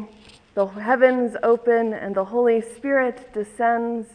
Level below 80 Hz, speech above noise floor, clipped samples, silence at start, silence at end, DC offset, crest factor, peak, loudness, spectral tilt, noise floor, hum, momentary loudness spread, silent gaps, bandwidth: -62 dBFS; 28 dB; under 0.1%; 0 s; 0.1 s; under 0.1%; 18 dB; -4 dBFS; -21 LUFS; -6 dB/octave; -49 dBFS; none; 10 LU; none; 10 kHz